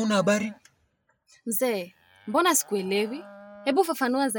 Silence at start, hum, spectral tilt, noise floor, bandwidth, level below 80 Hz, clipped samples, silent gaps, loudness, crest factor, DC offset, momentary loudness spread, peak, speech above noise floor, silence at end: 0 s; none; -3.5 dB/octave; -71 dBFS; 17.5 kHz; -78 dBFS; under 0.1%; none; -26 LUFS; 18 dB; under 0.1%; 18 LU; -8 dBFS; 45 dB; 0 s